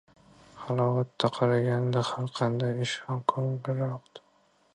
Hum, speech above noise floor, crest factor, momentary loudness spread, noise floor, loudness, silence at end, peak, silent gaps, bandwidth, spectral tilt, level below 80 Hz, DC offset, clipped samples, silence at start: none; 38 dB; 22 dB; 7 LU; -66 dBFS; -29 LUFS; 0.55 s; -8 dBFS; none; 10 kHz; -6.5 dB/octave; -70 dBFS; under 0.1%; under 0.1%; 0.55 s